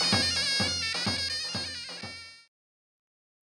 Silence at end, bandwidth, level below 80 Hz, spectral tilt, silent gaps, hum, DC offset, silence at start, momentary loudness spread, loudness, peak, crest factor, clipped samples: 1.1 s; 16 kHz; -58 dBFS; -2 dB/octave; none; none; under 0.1%; 0 s; 16 LU; -27 LUFS; -8 dBFS; 24 dB; under 0.1%